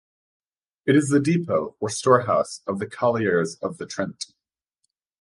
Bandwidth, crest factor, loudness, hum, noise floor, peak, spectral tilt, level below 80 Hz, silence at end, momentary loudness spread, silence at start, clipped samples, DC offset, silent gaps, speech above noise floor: 11.5 kHz; 20 dB; -23 LUFS; none; -77 dBFS; -4 dBFS; -5.5 dB/octave; -62 dBFS; 0.95 s; 11 LU; 0.85 s; under 0.1%; under 0.1%; none; 55 dB